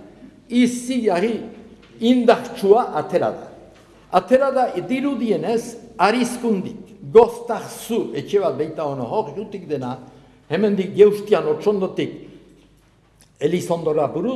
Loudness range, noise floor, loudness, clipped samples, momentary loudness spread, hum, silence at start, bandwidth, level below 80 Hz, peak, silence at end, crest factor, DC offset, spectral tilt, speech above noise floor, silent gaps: 3 LU; -55 dBFS; -20 LUFS; under 0.1%; 13 LU; none; 0 s; 13.5 kHz; -58 dBFS; 0 dBFS; 0 s; 20 dB; under 0.1%; -6 dB/octave; 36 dB; none